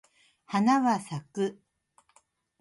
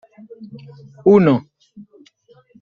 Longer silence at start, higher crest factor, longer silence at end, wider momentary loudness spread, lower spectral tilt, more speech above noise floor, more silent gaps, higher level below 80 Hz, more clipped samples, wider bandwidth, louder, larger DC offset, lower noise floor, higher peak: about the same, 0.5 s vs 0.4 s; about the same, 18 dB vs 18 dB; about the same, 1.1 s vs 1.2 s; second, 10 LU vs 26 LU; second, -6 dB/octave vs -9.5 dB/octave; first, 41 dB vs 36 dB; neither; second, -76 dBFS vs -60 dBFS; neither; first, 11.5 kHz vs 6.6 kHz; second, -28 LUFS vs -15 LUFS; neither; first, -67 dBFS vs -53 dBFS; second, -12 dBFS vs -2 dBFS